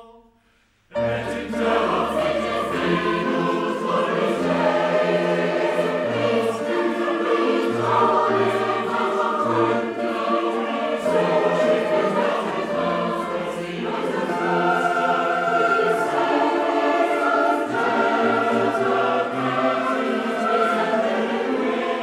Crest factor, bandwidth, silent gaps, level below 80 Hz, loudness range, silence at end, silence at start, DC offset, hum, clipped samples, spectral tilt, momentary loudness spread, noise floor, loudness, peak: 14 dB; 15 kHz; none; -58 dBFS; 3 LU; 0 s; 0 s; under 0.1%; none; under 0.1%; -5.5 dB/octave; 5 LU; -61 dBFS; -21 LUFS; -6 dBFS